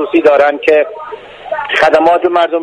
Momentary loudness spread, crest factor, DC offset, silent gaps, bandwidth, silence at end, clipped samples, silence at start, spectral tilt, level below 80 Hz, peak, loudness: 18 LU; 10 dB; under 0.1%; none; 10.5 kHz; 0 s; 0.3%; 0 s; -4.5 dB/octave; -50 dBFS; 0 dBFS; -10 LUFS